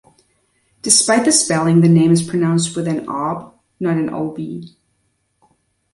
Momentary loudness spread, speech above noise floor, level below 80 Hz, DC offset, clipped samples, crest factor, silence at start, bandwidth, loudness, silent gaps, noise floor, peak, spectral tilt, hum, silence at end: 17 LU; 51 dB; -58 dBFS; under 0.1%; under 0.1%; 18 dB; 0.85 s; 11.5 kHz; -15 LUFS; none; -66 dBFS; 0 dBFS; -4.5 dB/octave; none; 1.25 s